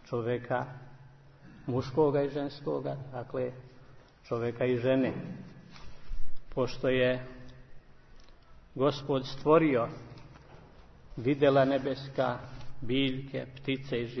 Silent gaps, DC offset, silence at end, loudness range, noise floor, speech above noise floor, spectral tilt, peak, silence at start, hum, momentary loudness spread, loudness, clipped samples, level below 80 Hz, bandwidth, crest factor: none; under 0.1%; 0 s; 5 LU; -54 dBFS; 24 dB; -7.5 dB/octave; -10 dBFS; 0.05 s; none; 22 LU; -31 LUFS; under 0.1%; -50 dBFS; 6.4 kHz; 20 dB